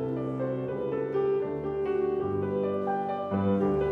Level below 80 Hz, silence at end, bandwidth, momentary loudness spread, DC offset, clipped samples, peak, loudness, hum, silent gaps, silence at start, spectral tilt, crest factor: -56 dBFS; 0 s; 4.3 kHz; 5 LU; under 0.1%; under 0.1%; -16 dBFS; -29 LUFS; none; none; 0 s; -10 dB/octave; 12 dB